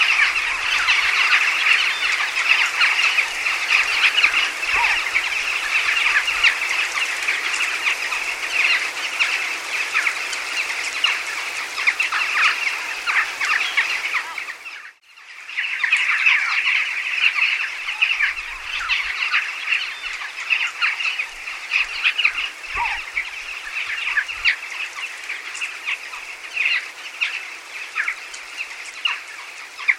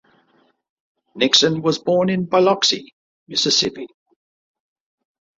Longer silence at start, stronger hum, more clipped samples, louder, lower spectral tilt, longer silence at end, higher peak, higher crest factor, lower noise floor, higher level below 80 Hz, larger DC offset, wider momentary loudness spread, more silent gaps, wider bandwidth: second, 0 s vs 1.15 s; neither; neither; about the same, -19 LUFS vs -17 LUFS; second, 2 dB/octave vs -3.5 dB/octave; second, 0 s vs 1.55 s; about the same, -2 dBFS vs 0 dBFS; about the same, 20 dB vs 22 dB; second, -43 dBFS vs -61 dBFS; first, -56 dBFS vs -62 dBFS; neither; about the same, 13 LU vs 11 LU; second, none vs 2.93-3.26 s; first, 16.5 kHz vs 7.8 kHz